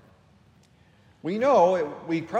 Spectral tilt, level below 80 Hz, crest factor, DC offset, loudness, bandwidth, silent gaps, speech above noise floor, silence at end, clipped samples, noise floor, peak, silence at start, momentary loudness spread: -6.5 dB/octave; -70 dBFS; 18 dB; under 0.1%; -23 LUFS; 8.8 kHz; none; 35 dB; 0 s; under 0.1%; -58 dBFS; -8 dBFS; 1.25 s; 13 LU